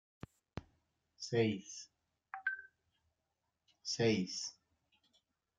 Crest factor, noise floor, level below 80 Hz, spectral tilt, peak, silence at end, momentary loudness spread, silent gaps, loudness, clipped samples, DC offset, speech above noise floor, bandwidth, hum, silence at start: 22 dB; -87 dBFS; -74 dBFS; -4.5 dB/octave; -20 dBFS; 1.05 s; 19 LU; none; -38 LUFS; under 0.1%; under 0.1%; 51 dB; 9.4 kHz; none; 0.55 s